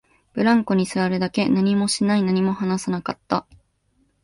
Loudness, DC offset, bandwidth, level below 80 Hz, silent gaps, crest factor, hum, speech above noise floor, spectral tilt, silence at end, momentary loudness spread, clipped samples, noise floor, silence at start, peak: -21 LUFS; under 0.1%; 11.5 kHz; -58 dBFS; none; 16 dB; none; 45 dB; -5.5 dB/octave; 0.85 s; 7 LU; under 0.1%; -65 dBFS; 0.35 s; -6 dBFS